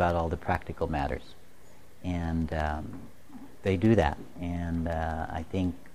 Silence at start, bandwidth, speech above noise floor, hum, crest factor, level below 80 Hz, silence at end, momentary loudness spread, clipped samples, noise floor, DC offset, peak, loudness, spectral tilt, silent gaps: 0 s; 13.5 kHz; 27 dB; none; 22 dB; -42 dBFS; 0.05 s; 16 LU; under 0.1%; -56 dBFS; 0.7%; -8 dBFS; -31 LUFS; -8 dB/octave; none